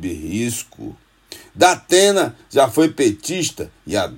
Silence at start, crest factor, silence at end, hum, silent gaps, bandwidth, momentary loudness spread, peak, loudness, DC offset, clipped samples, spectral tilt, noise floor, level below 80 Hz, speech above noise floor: 0 s; 18 dB; 0 s; none; none; 16.5 kHz; 20 LU; 0 dBFS; -17 LUFS; under 0.1%; under 0.1%; -3.5 dB/octave; -42 dBFS; -52 dBFS; 24 dB